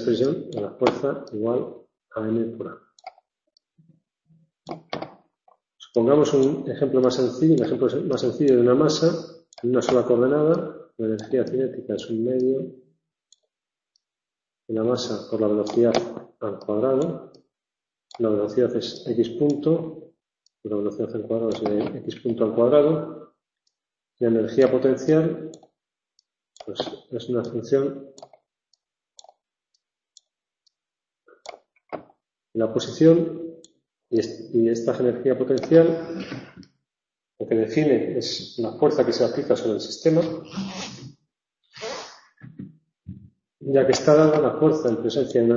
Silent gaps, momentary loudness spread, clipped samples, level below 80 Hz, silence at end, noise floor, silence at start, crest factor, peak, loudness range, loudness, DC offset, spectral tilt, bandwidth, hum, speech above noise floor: none; 19 LU; under 0.1%; -64 dBFS; 0 s; -90 dBFS; 0 s; 22 dB; -2 dBFS; 10 LU; -22 LUFS; under 0.1%; -6.5 dB/octave; 7.6 kHz; none; 68 dB